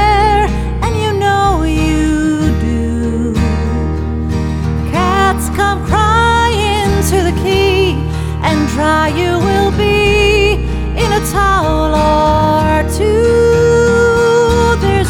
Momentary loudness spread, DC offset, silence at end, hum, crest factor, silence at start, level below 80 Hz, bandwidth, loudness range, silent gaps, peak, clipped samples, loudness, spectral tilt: 7 LU; 1%; 0 s; none; 12 dB; 0 s; -20 dBFS; 16.5 kHz; 4 LU; none; 0 dBFS; under 0.1%; -12 LUFS; -5.5 dB/octave